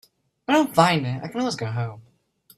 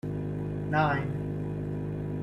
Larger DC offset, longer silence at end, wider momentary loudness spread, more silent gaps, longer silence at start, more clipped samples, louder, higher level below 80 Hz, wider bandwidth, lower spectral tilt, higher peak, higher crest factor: neither; first, 0.55 s vs 0 s; first, 13 LU vs 8 LU; neither; first, 0.5 s vs 0.05 s; neither; first, -22 LUFS vs -31 LUFS; second, -62 dBFS vs -48 dBFS; first, 15.5 kHz vs 6 kHz; second, -5.5 dB/octave vs -9 dB/octave; first, -2 dBFS vs -12 dBFS; about the same, 22 dB vs 18 dB